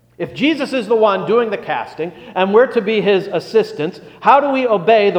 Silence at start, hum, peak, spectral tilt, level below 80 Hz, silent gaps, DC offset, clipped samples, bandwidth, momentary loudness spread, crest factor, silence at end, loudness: 0.2 s; none; 0 dBFS; -6 dB/octave; -60 dBFS; none; under 0.1%; under 0.1%; 9.8 kHz; 11 LU; 16 dB; 0 s; -16 LUFS